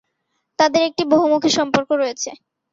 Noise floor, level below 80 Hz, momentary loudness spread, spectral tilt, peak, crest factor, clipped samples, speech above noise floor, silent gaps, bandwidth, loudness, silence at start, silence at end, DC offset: -73 dBFS; -62 dBFS; 12 LU; -3.5 dB/octave; -2 dBFS; 16 dB; under 0.1%; 55 dB; none; 7.8 kHz; -18 LUFS; 0.6 s; 0.4 s; under 0.1%